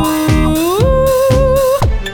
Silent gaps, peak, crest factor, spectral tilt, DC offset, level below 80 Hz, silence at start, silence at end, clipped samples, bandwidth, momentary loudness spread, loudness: none; 0 dBFS; 10 dB; -6 dB/octave; under 0.1%; -18 dBFS; 0 s; 0 s; under 0.1%; 19.5 kHz; 2 LU; -12 LUFS